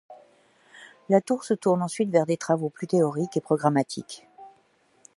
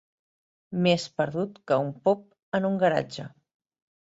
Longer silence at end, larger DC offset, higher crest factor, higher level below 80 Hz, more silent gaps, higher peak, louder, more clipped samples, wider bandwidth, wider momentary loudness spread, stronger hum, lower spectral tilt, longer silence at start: second, 0.7 s vs 0.9 s; neither; about the same, 20 dB vs 18 dB; second, -76 dBFS vs -68 dBFS; second, none vs 2.43-2.52 s; first, -6 dBFS vs -10 dBFS; about the same, -25 LUFS vs -27 LUFS; neither; first, 11.5 kHz vs 8 kHz; second, 8 LU vs 12 LU; neither; about the same, -6.5 dB/octave vs -6 dB/octave; second, 0.1 s vs 0.7 s